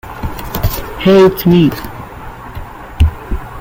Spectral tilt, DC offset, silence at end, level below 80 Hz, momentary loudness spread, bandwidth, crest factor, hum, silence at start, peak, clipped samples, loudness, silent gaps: -7 dB/octave; under 0.1%; 0 s; -24 dBFS; 21 LU; 17 kHz; 12 dB; none; 0.05 s; -2 dBFS; under 0.1%; -12 LUFS; none